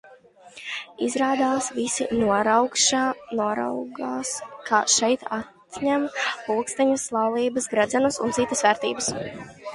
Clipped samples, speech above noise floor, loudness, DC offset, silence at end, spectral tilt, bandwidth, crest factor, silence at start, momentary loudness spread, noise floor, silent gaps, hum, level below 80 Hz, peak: under 0.1%; 26 dB; -23 LUFS; under 0.1%; 0 s; -2.5 dB/octave; 11.5 kHz; 20 dB; 0.05 s; 13 LU; -50 dBFS; none; none; -60 dBFS; -4 dBFS